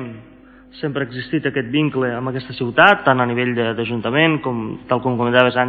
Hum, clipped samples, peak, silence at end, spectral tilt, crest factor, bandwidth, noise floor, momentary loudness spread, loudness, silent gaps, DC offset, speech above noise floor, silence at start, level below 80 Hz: none; under 0.1%; 0 dBFS; 0 s; -8 dB/octave; 18 dB; 5.8 kHz; -45 dBFS; 12 LU; -18 LUFS; none; under 0.1%; 27 dB; 0 s; -54 dBFS